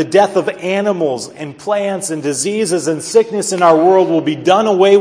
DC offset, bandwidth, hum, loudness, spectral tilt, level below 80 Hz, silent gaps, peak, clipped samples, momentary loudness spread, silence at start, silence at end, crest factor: under 0.1%; 11 kHz; none; -14 LUFS; -4.5 dB/octave; -66 dBFS; none; 0 dBFS; under 0.1%; 9 LU; 0 s; 0 s; 14 dB